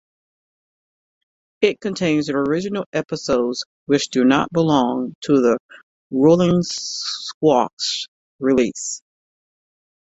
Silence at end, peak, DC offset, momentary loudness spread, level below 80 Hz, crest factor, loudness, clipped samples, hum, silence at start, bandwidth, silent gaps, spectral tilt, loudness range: 1.1 s; -2 dBFS; under 0.1%; 9 LU; -56 dBFS; 18 dB; -19 LUFS; under 0.1%; none; 1.6 s; 8.2 kHz; 2.86-2.93 s, 3.66-3.86 s, 5.15-5.22 s, 5.60-5.69 s, 5.83-6.10 s, 7.34-7.41 s, 7.73-7.77 s, 8.08-8.39 s; -5 dB/octave; 4 LU